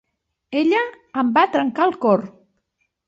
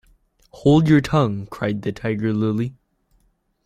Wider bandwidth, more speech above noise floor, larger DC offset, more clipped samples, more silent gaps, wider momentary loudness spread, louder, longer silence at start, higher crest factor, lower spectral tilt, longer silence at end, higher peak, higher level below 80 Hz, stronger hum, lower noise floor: second, 7.8 kHz vs 12 kHz; first, 53 dB vs 45 dB; neither; neither; neither; about the same, 9 LU vs 11 LU; about the same, -19 LUFS vs -20 LUFS; about the same, 0.5 s vs 0.55 s; about the same, 18 dB vs 18 dB; about the same, -7 dB/octave vs -8 dB/octave; second, 0.75 s vs 0.95 s; about the same, -4 dBFS vs -4 dBFS; second, -66 dBFS vs -48 dBFS; neither; first, -72 dBFS vs -64 dBFS